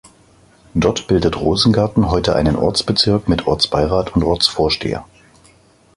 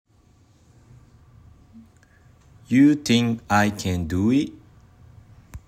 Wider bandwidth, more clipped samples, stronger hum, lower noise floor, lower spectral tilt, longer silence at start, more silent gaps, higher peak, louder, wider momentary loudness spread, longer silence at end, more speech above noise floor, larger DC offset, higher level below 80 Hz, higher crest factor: second, 14 kHz vs 15.5 kHz; neither; neither; second, -51 dBFS vs -57 dBFS; about the same, -5.5 dB/octave vs -5.5 dB/octave; second, 0.75 s vs 1.75 s; neither; first, 0 dBFS vs -6 dBFS; first, -16 LUFS vs -21 LUFS; second, 4 LU vs 8 LU; first, 0.9 s vs 0.1 s; about the same, 35 dB vs 37 dB; neither; first, -32 dBFS vs -52 dBFS; about the same, 16 dB vs 18 dB